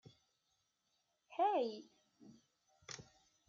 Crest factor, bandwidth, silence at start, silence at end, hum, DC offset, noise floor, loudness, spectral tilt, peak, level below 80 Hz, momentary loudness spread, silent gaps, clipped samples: 20 dB; 7.4 kHz; 1.3 s; 0.45 s; none; under 0.1%; -84 dBFS; -40 LUFS; -3 dB/octave; -26 dBFS; -86 dBFS; 19 LU; none; under 0.1%